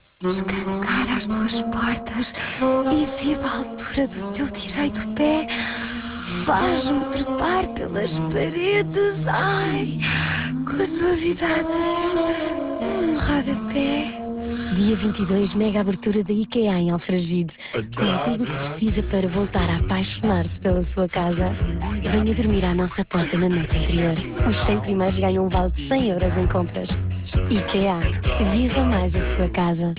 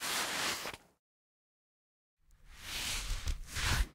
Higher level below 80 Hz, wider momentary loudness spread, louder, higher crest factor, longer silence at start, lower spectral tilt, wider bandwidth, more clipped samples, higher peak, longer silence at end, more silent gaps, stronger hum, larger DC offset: first, -32 dBFS vs -44 dBFS; second, 6 LU vs 11 LU; first, -23 LUFS vs -36 LUFS; second, 14 dB vs 20 dB; first, 0.2 s vs 0 s; first, -11 dB/octave vs -2 dB/octave; second, 4 kHz vs 16 kHz; neither; first, -8 dBFS vs -18 dBFS; about the same, 0 s vs 0 s; second, none vs 0.99-2.17 s; neither; neither